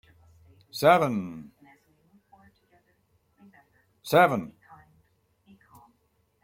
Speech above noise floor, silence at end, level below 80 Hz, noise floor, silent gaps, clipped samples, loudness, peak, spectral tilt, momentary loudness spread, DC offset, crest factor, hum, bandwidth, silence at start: 48 dB; 1.95 s; -68 dBFS; -71 dBFS; none; under 0.1%; -23 LUFS; -6 dBFS; -5.5 dB/octave; 24 LU; under 0.1%; 24 dB; none; 16.5 kHz; 0.75 s